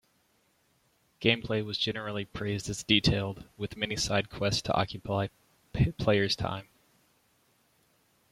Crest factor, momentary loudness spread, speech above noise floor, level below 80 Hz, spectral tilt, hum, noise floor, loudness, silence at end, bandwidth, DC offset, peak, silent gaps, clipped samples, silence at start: 24 dB; 11 LU; 40 dB; -50 dBFS; -4.5 dB/octave; none; -70 dBFS; -30 LUFS; 1.7 s; 15 kHz; under 0.1%; -8 dBFS; none; under 0.1%; 1.2 s